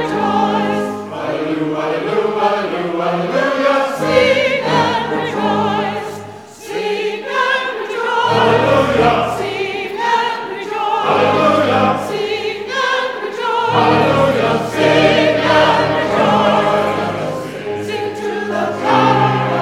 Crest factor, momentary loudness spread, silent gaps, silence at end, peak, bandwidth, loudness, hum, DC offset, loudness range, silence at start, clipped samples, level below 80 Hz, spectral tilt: 14 dB; 9 LU; none; 0 s; 0 dBFS; 16 kHz; -15 LUFS; none; 0.1%; 4 LU; 0 s; under 0.1%; -48 dBFS; -5.5 dB/octave